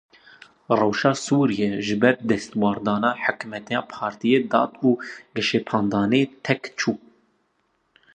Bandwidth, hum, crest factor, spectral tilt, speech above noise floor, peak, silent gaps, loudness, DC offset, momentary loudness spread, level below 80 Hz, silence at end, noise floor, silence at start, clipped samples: 9.8 kHz; none; 20 dB; -5.5 dB/octave; 47 dB; -2 dBFS; none; -22 LUFS; under 0.1%; 8 LU; -62 dBFS; 1.2 s; -69 dBFS; 0.7 s; under 0.1%